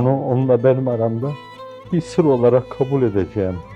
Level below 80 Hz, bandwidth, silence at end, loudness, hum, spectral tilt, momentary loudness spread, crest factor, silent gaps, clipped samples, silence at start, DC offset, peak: -50 dBFS; 9.4 kHz; 0 s; -18 LUFS; none; -9 dB/octave; 11 LU; 16 dB; none; under 0.1%; 0 s; under 0.1%; -2 dBFS